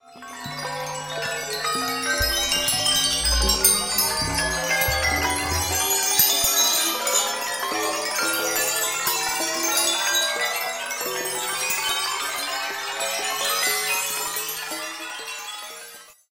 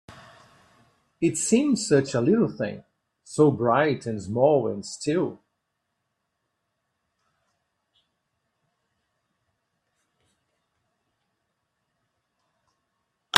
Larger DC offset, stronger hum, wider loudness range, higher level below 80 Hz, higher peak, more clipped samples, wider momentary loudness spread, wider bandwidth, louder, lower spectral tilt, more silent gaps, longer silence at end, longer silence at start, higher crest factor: neither; neither; second, 5 LU vs 11 LU; first, -40 dBFS vs -68 dBFS; about the same, -2 dBFS vs 0 dBFS; neither; about the same, 13 LU vs 11 LU; first, 17 kHz vs 12.5 kHz; first, -21 LUFS vs -24 LUFS; second, -0.5 dB/octave vs -5 dB/octave; neither; first, 0.2 s vs 0 s; about the same, 0.05 s vs 0.1 s; second, 22 dB vs 28 dB